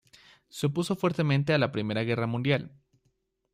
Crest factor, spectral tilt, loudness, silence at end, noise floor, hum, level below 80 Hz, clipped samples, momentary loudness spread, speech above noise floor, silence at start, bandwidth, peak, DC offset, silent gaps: 18 dB; -6.5 dB/octave; -28 LUFS; 0.85 s; -74 dBFS; none; -64 dBFS; under 0.1%; 6 LU; 47 dB; 0.55 s; 14.5 kHz; -12 dBFS; under 0.1%; none